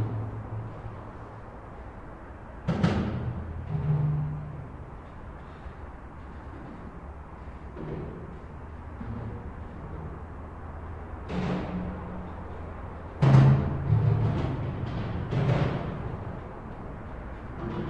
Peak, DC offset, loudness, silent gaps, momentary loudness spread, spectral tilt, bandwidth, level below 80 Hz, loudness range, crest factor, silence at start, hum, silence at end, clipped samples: -8 dBFS; under 0.1%; -30 LUFS; none; 18 LU; -9 dB/octave; 7 kHz; -44 dBFS; 16 LU; 22 dB; 0 s; none; 0 s; under 0.1%